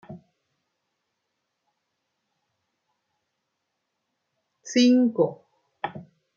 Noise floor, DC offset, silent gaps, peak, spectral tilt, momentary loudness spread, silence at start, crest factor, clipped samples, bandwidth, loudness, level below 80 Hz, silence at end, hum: -80 dBFS; under 0.1%; none; -8 dBFS; -4.5 dB/octave; 17 LU; 0.1 s; 20 dB; under 0.1%; 7.4 kHz; -22 LUFS; -78 dBFS; 0.35 s; none